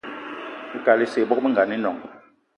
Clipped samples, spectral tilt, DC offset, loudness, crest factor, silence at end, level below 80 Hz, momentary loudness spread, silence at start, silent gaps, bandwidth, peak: under 0.1%; -6 dB/octave; under 0.1%; -21 LUFS; 20 dB; 0.4 s; -72 dBFS; 14 LU; 0.05 s; none; 11 kHz; -4 dBFS